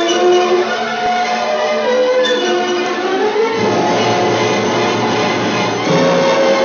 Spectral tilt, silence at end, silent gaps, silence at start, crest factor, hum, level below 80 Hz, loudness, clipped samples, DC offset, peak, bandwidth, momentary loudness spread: -4 dB/octave; 0 s; none; 0 s; 10 dB; none; -58 dBFS; -14 LUFS; under 0.1%; under 0.1%; -2 dBFS; 7.4 kHz; 4 LU